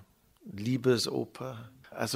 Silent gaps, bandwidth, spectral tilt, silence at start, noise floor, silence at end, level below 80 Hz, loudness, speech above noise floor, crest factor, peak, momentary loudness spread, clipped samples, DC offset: none; 16 kHz; -5 dB/octave; 0 s; -53 dBFS; 0 s; -68 dBFS; -32 LUFS; 22 dB; 20 dB; -14 dBFS; 20 LU; under 0.1%; under 0.1%